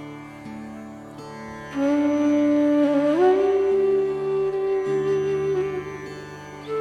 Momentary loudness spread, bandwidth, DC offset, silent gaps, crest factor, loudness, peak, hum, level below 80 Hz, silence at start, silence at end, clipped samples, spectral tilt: 19 LU; 9.4 kHz; under 0.1%; none; 14 dB; -21 LUFS; -8 dBFS; none; -56 dBFS; 0 s; 0 s; under 0.1%; -7 dB/octave